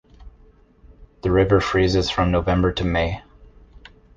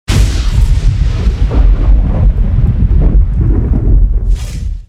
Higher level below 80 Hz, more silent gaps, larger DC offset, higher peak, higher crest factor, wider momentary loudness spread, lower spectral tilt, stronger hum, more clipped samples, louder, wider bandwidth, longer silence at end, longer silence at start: second, -34 dBFS vs -10 dBFS; neither; neither; second, -4 dBFS vs 0 dBFS; first, 18 dB vs 8 dB; first, 9 LU vs 3 LU; about the same, -6.5 dB/octave vs -7 dB/octave; neither; second, under 0.1% vs 0.2%; second, -20 LUFS vs -13 LUFS; second, 7.6 kHz vs 10 kHz; first, 0.7 s vs 0.05 s; about the same, 0.2 s vs 0.1 s